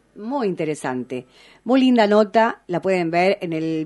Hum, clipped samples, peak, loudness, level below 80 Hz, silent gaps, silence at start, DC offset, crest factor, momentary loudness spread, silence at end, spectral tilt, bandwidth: none; under 0.1%; -2 dBFS; -20 LUFS; -66 dBFS; none; 0.15 s; under 0.1%; 18 dB; 13 LU; 0 s; -6 dB/octave; 11.5 kHz